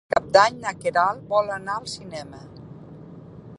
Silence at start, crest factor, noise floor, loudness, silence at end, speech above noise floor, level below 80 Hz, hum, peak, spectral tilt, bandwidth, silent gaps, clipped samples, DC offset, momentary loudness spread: 0.1 s; 24 dB; -42 dBFS; -22 LUFS; 0.05 s; 19 dB; -58 dBFS; none; -2 dBFS; -3.5 dB/octave; 11.5 kHz; none; under 0.1%; under 0.1%; 25 LU